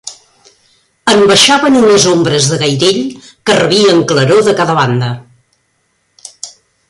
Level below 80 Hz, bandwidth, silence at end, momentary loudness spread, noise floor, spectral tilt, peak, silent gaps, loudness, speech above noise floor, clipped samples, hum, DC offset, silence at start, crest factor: -50 dBFS; 15 kHz; 0.4 s; 20 LU; -60 dBFS; -4 dB/octave; 0 dBFS; none; -9 LUFS; 51 dB; under 0.1%; none; under 0.1%; 0.05 s; 12 dB